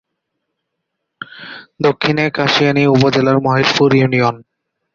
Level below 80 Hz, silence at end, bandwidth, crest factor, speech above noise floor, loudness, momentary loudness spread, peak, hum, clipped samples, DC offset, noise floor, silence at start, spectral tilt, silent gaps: -52 dBFS; 0.55 s; 7.6 kHz; 16 dB; 62 dB; -13 LUFS; 21 LU; 0 dBFS; none; under 0.1%; under 0.1%; -75 dBFS; 1.35 s; -6 dB/octave; none